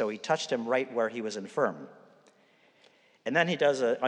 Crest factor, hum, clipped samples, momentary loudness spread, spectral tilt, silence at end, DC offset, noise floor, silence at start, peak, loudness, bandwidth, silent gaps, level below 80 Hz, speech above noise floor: 20 dB; none; under 0.1%; 12 LU; -4.5 dB/octave; 0 s; under 0.1%; -64 dBFS; 0 s; -10 dBFS; -29 LUFS; 10 kHz; none; under -90 dBFS; 35 dB